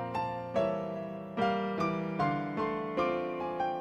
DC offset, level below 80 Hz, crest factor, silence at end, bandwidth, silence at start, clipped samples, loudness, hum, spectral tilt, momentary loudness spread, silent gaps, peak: under 0.1%; -62 dBFS; 16 dB; 0 s; 9.4 kHz; 0 s; under 0.1%; -33 LUFS; none; -7.5 dB/octave; 4 LU; none; -16 dBFS